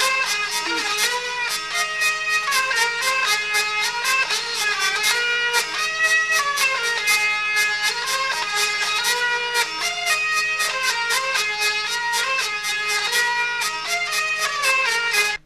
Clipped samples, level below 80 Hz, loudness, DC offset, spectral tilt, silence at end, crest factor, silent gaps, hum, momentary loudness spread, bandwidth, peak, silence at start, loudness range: under 0.1%; -58 dBFS; -19 LUFS; under 0.1%; 2 dB/octave; 0.1 s; 18 dB; none; none; 4 LU; 14 kHz; -4 dBFS; 0 s; 2 LU